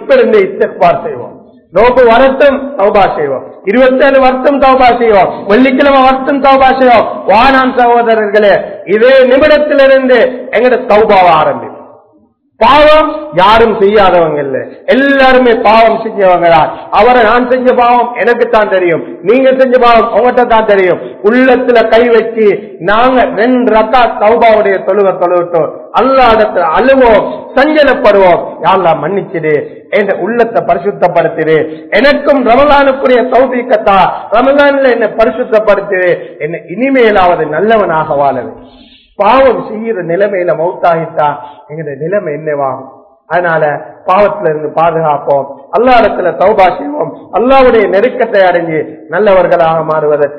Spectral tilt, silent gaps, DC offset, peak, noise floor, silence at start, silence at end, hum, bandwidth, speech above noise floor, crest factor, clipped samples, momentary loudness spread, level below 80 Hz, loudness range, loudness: -7.5 dB/octave; none; 0.6%; 0 dBFS; -49 dBFS; 0 s; 0 s; none; 5.4 kHz; 41 dB; 8 dB; 2%; 9 LU; -34 dBFS; 5 LU; -8 LUFS